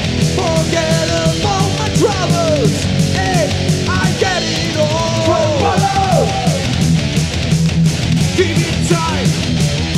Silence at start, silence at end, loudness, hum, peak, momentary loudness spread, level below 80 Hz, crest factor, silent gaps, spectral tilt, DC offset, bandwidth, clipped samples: 0 s; 0 s; -14 LUFS; none; 0 dBFS; 2 LU; -30 dBFS; 14 dB; none; -5 dB/octave; under 0.1%; 14.5 kHz; under 0.1%